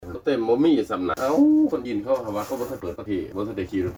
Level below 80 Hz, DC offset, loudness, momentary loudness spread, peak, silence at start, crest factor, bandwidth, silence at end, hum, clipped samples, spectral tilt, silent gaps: -52 dBFS; under 0.1%; -23 LUFS; 11 LU; -10 dBFS; 0 s; 14 dB; over 20 kHz; 0 s; none; under 0.1%; -6.5 dB/octave; none